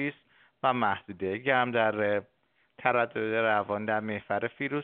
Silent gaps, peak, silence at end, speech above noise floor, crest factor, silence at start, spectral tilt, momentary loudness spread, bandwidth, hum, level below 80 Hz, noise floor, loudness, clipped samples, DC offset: none; -8 dBFS; 0 s; 34 dB; 22 dB; 0 s; -3.5 dB/octave; 6 LU; 4.4 kHz; none; -74 dBFS; -62 dBFS; -29 LUFS; under 0.1%; under 0.1%